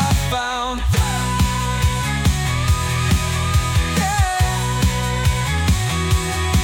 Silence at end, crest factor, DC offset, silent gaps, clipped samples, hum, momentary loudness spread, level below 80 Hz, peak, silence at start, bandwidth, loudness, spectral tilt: 0 s; 12 dB; under 0.1%; none; under 0.1%; none; 1 LU; -24 dBFS; -6 dBFS; 0 s; 18.5 kHz; -19 LUFS; -4.5 dB/octave